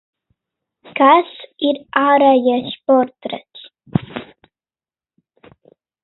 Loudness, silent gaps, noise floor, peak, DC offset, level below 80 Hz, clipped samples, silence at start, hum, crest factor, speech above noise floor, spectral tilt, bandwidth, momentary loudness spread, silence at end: -15 LUFS; none; under -90 dBFS; 0 dBFS; under 0.1%; -58 dBFS; under 0.1%; 0.95 s; none; 18 dB; over 76 dB; -10 dB/octave; 4.1 kHz; 18 LU; 1.8 s